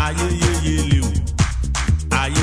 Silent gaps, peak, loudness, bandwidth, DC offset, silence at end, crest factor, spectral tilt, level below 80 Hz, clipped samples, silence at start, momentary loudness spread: none; -2 dBFS; -19 LUFS; 11 kHz; under 0.1%; 0 s; 16 dB; -4.5 dB/octave; -22 dBFS; under 0.1%; 0 s; 3 LU